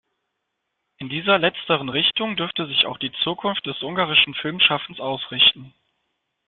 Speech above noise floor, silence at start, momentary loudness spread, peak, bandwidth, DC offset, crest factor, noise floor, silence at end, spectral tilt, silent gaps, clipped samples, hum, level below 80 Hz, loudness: 56 dB; 1 s; 11 LU; -2 dBFS; 13.5 kHz; under 0.1%; 22 dB; -78 dBFS; 0.8 s; -8 dB/octave; none; under 0.1%; none; -60 dBFS; -20 LUFS